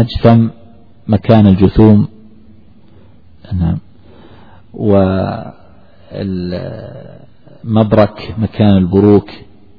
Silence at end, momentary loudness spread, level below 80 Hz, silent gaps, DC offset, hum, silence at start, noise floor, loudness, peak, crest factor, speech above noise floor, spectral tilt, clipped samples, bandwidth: 0.4 s; 21 LU; -34 dBFS; none; 0.9%; none; 0 s; -44 dBFS; -12 LUFS; 0 dBFS; 14 dB; 33 dB; -11 dB/octave; 0.5%; 5.2 kHz